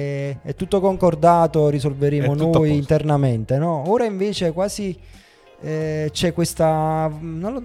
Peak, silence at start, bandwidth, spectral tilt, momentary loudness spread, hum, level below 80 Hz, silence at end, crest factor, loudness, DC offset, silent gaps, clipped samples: -2 dBFS; 0 s; 14.5 kHz; -7 dB/octave; 12 LU; none; -44 dBFS; 0 s; 16 dB; -20 LUFS; under 0.1%; none; under 0.1%